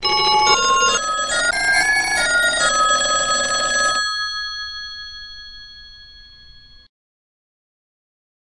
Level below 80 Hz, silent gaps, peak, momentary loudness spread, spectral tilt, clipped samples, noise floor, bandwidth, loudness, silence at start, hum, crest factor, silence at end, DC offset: -46 dBFS; none; 0 dBFS; 18 LU; 0.5 dB/octave; under 0.1%; -44 dBFS; 12 kHz; -16 LUFS; 0 s; none; 20 dB; 1.95 s; under 0.1%